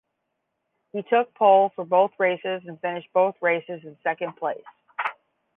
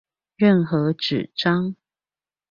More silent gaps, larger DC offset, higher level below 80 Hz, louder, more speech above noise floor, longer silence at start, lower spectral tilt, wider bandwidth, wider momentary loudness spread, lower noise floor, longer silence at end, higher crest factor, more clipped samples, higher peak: neither; neither; second, -82 dBFS vs -62 dBFS; about the same, -23 LUFS vs -21 LUFS; second, 55 dB vs over 70 dB; first, 0.95 s vs 0.4 s; about the same, -8 dB/octave vs -7.5 dB/octave; second, 3.8 kHz vs 7 kHz; first, 15 LU vs 6 LU; second, -78 dBFS vs under -90 dBFS; second, 0.45 s vs 0.8 s; about the same, 20 dB vs 18 dB; neither; about the same, -6 dBFS vs -6 dBFS